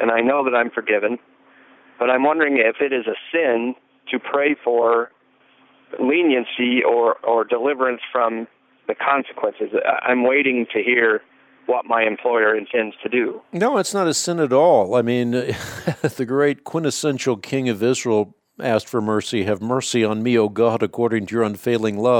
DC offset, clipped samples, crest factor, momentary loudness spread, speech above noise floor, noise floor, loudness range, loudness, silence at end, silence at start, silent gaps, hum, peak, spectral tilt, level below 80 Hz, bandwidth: under 0.1%; under 0.1%; 16 dB; 8 LU; 37 dB; -56 dBFS; 3 LU; -20 LUFS; 0 s; 0 s; none; none; -4 dBFS; -4.5 dB/octave; -66 dBFS; 17 kHz